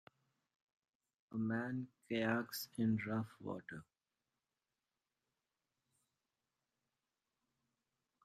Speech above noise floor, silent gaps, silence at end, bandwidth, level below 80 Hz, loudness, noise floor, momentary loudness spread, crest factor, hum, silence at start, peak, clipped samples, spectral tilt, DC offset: over 49 dB; none; 4.4 s; 14.5 kHz; -80 dBFS; -41 LUFS; under -90 dBFS; 11 LU; 22 dB; none; 1.3 s; -24 dBFS; under 0.1%; -6 dB/octave; under 0.1%